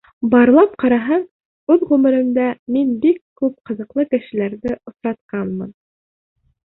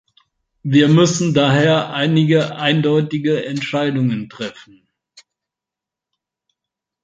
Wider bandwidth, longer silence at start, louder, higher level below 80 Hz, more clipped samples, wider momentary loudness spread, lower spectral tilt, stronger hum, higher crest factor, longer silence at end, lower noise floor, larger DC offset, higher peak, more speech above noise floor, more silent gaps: second, 4.1 kHz vs 9 kHz; second, 0.2 s vs 0.65 s; about the same, -17 LUFS vs -16 LUFS; about the same, -56 dBFS vs -58 dBFS; neither; about the same, 13 LU vs 12 LU; first, -10 dB/octave vs -5.5 dB/octave; neither; about the same, 16 dB vs 16 dB; second, 1.05 s vs 2.55 s; first, under -90 dBFS vs -86 dBFS; neither; about the same, -2 dBFS vs -2 dBFS; first, over 74 dB vs 70 dB; first, 1.31-1.67 s, 2.59-2.66 s, 3.21-3.36 s, 5.21-5.29 s vs none